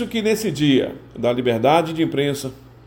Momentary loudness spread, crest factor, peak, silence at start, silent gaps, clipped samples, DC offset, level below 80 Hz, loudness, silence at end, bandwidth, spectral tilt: 10 LU; 18 dB; -2 dBFS; 0 s; none; under 0.1%; under 0.1%; -52 dBFS; -20 LUFS; 0.25 s; 17 kHz; -5.5 dB/octave